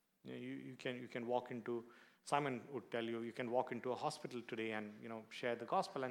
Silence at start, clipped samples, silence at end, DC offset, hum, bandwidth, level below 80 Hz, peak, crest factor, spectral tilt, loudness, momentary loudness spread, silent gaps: 0.25 s; under 0.1%; 0 s; under 0.1%; none; 18.5 kHz; under -90 dBFS; -20 dBFS; 24 dB; -5 dB/octave; -44 LUFS; 10 LU; none